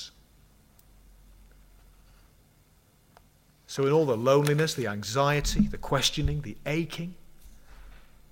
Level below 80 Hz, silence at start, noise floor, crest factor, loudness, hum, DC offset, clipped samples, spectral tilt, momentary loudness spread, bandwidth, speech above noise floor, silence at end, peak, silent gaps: -42 dBFS; 0 s; -61 dBFS; 20 dB; -27 LUFS; none; under 0.1%; under 0.1%; -5 dB/octave; 13 LU; 16.5 kHz; 35 dB; 0.3 s; -10 dBFS; none